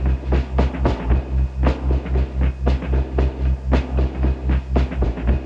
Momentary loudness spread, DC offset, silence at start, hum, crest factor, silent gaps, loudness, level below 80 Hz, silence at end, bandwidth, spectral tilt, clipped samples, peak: 3 LU; under 0.1%; 0 s; none; 14 dB; none; -21 LUFS; -20 dBFS; 0 s; 5.4 kHz; -9 dB/octave; under 0.1%; -4 dBFS